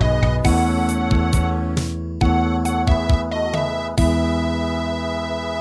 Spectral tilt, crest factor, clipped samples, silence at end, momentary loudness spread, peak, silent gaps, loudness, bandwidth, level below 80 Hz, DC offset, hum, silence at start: -6.5 dB/octave; 16 dB; under 0.1%; 0 s; 6 LU; -4 dBFS; none; -20 LUFS; 11 kHz; -24 dBFS; 0.1%; none; 0 s